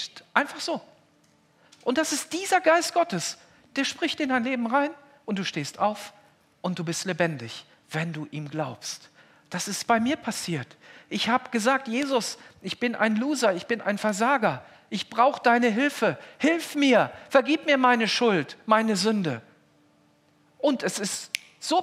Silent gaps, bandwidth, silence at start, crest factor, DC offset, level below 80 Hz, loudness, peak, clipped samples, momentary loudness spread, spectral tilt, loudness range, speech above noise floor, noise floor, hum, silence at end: none; 15.5 kHz; 0 s; 22 dB; under 0.1%; -76 dBFS; -25 LUFS; -4 dBFS; under 0.1%; 14 LU; -4 dB/octave; 8 LU; 37 dB; -62 dBFS; none; 0 s